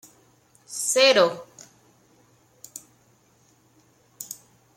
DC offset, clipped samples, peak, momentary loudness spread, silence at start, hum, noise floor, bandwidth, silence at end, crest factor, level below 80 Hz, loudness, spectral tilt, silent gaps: under 0.1%; under 0.1%; -6 dBFS; 25 LU; 0.7 s; none; -61 dBFS; 16.5 kHz; 0.45 s; 22 dB; -76 dBFS; -20 LUFS; -1 dB/octave; none